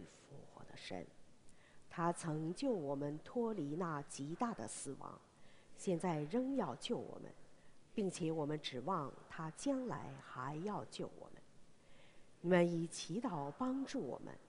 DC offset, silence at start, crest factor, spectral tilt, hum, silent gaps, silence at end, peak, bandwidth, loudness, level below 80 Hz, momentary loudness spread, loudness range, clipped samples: under 0.1%; 0 s; 24 dB; -5.5 dB/octave; none; none; 0 s; -18 dBFS; 10.5 kHz; -42 LUFS; -72 dBFS; 14 LU; 3 LU; under 0.1%